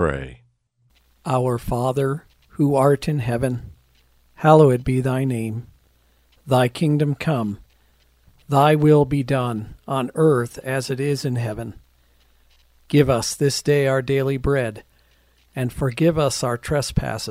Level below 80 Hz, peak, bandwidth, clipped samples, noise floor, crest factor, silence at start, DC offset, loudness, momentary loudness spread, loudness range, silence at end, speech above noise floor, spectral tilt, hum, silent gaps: -42 dBFS; 0 dBFS; 15.5 kHz; under 0.1%; -63 dBFS; 20 dB; 0 s; under 0.1%; -20 LUFS; 14 LU; 4 LU; 0 s; 43 dB; -6.5 dB/octave; none; none